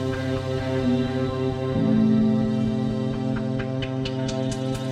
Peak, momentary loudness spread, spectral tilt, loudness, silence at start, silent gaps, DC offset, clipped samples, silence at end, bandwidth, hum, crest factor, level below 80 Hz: -10 dBFS; 7 LU; -7.5 dB/octave; -24 LUFS; 0 s; none; under 0.1%; under 0.1%; 0 s; 10.5 kHz; none; 14 dB; -44 dBFS